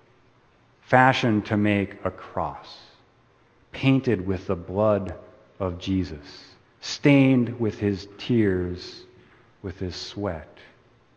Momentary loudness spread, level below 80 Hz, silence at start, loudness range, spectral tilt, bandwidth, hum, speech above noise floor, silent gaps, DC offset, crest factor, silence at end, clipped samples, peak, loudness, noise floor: 21 LU; -54 dBFS; 0.9 s; 4 LU; -7 dB/octave; 8.6 kHz; none; 36 dB; none; under 0.1%; 24 dB; 0.7 s; under 0.1%; -2 dBFS; -24 LUFS; -59 dBFS